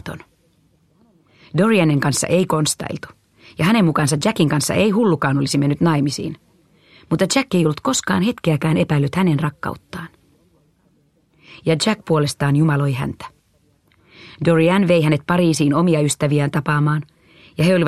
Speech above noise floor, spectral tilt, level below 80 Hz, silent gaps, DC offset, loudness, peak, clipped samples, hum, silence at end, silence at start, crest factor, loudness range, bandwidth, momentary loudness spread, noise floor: 42 dB; -5.5 dB/octave; -52 dBFS; none; under 0.1%; -18 LUFS; -2 dBFS; under 0.1%; none; 0 s; 0.05 s; 16 dB; 4 LU; 14 kHz; 14 LU; -60 dBFS